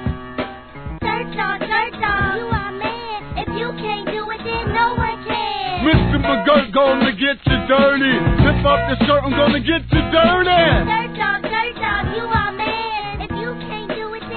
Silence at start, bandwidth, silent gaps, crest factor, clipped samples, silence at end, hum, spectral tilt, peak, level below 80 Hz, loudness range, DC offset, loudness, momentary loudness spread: 0 s; 4.6 kHz; none; 18 dB; under 0.1%; 0 s; none; -9.5 dB/octave; 0 dBFS; -30 dBFS; 7 LU; 0.2%; -18 LUFS; 12 LU